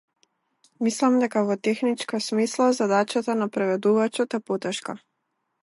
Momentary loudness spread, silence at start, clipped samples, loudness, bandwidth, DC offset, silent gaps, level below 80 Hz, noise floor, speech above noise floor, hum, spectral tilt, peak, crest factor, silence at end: 7 LU; 0.8 s; under 0.1%; -24 LUFS; 11.5 kHz; under 0.1%; none; -78 dBFS; -77 dBFS; 54 dB; none; -4.5 dB/octave; -8 dBFS; 16 dB; 0.65 s